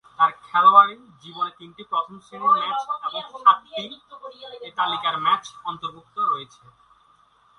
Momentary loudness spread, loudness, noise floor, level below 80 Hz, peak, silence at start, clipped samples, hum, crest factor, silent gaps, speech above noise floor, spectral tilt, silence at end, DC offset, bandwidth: 21 LU; -21 LUFS; -58 dBFS; -72 dBFS; 0 dBFS; 0.2 s; under 0.1%; none; 22 dB; none; 36 dB; -3 dB/octave; 1.15 s; under 0.1%; 10 kHz